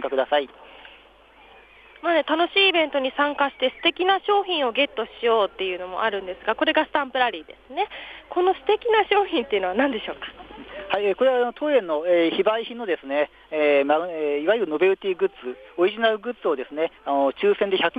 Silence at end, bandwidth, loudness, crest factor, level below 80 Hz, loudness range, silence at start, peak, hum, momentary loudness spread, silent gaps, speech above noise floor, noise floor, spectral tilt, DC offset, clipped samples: 0 s; 5 kHz; -22 LUFS; 16 dB; -60 dBFS; 3 LU; 0 s; -6 dBFS; none; 9 LU; none; 29 dB; -52 dBFS; -6 dB/octave; under 0.1%; under 0.1%